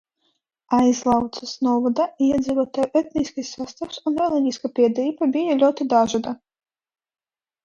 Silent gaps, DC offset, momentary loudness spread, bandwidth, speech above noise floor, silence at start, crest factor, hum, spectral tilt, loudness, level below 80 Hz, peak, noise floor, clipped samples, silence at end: none; under 0.1%; 11 LU; 7.4 kHz; 51 dB; 0.7 s; 16 dB; none; -5 dB/octave; -21 LUFS; -56 dBFS; -4 dBFS; -71 dBFS; under 0.1%; 1.3 s